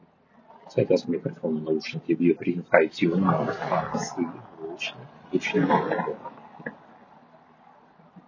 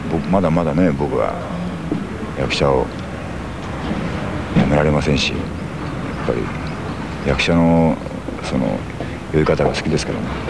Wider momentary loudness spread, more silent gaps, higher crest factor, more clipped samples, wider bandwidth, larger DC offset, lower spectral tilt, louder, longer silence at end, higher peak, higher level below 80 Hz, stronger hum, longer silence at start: first, 18 LU vs 11 LU; neither; first, 26 dB vs 18 dB; neither; second, 7.6 kHz vs 11 kHz; second, under 0.1% vs 0.8%; about the same, -6.5 dB/octave vs -6.5 dB/octave; second, -26 LUFS vs -19 LUFS; about the same, 0.1 s vs 0 s; about the same, 0 dBFS vs -2 dBFS; second, -66 dBFS vs -32 dBFS; neither; first, 0.65 s vs 0 s